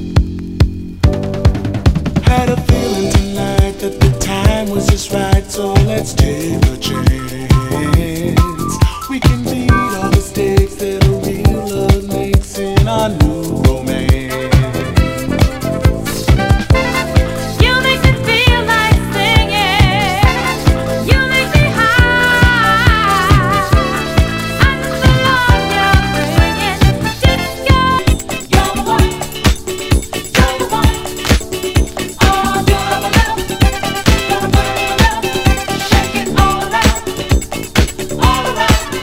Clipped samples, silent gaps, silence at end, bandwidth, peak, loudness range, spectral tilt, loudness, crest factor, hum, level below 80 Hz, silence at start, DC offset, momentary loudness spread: 0.6%; none; 0 s; 16.5 kHz; 0 dBFS; 4 LU; -5 dB/octave; -13 LUFS; 12 dB; none; -18 dBFS; 0 s; under 0.1%; 5 LU